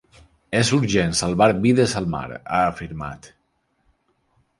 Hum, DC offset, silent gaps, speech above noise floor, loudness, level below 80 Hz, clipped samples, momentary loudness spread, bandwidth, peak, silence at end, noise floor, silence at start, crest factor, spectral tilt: none; under 0.1%; none; 49 dB; -20 LUFS; -46 dBFS; under 0.1%; 14 LU; 11.5 kHz; -2 dBFS; 1.35 s; -69 dBFS; 0.5 s; 20 dB; -5 dB/octave